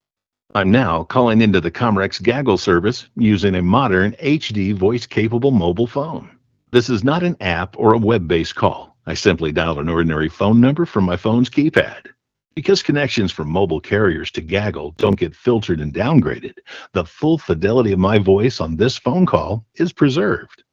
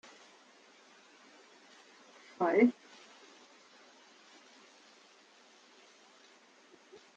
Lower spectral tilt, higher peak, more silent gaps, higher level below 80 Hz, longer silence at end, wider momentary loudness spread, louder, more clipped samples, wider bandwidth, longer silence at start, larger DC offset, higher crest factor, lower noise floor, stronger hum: first, -7 dB/octave vs -5.5 dB/octave; first, 0 dBFS vs -14 dBFS; neither; first, -42 dBFS vs under -90 dBFS; second, 0.25 s vs 4.45 s; second, 8 LU vs 29 LU; first, -17 LUFS vs -30 LUFS; neither; about the same, 7.6 kHz vs 7.8 kHz; second, 0.55 s vs 2.4 s; neither; second, 16 dB vs 24 dB; first, -83 dBFS vs -62 dBFS; neither